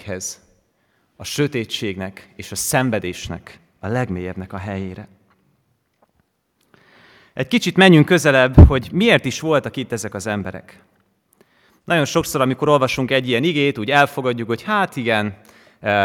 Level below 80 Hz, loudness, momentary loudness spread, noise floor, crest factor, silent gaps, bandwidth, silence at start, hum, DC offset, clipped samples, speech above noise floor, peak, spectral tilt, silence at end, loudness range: -32 dBFS; -18 LUFS; 19 LU; -66 dBFS; 18 dB; none; 17.5 kHz; 0.05 s; none; under 0.1%; under 0.1%; 49 dB; 0 dBFS; -5.5 dB/octave; 0 s; 15 LU